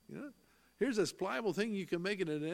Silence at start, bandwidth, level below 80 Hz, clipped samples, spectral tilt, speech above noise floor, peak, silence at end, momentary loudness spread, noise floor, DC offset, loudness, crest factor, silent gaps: 0.1 s; 16 kHz; -74 dBFS; under 0.1%; -5 dB/octave; 31 dB; -20 dBFS; 0 s; 15 LU; -67 dBFS; under 0.1%; -37 LUFS; 18 dB; none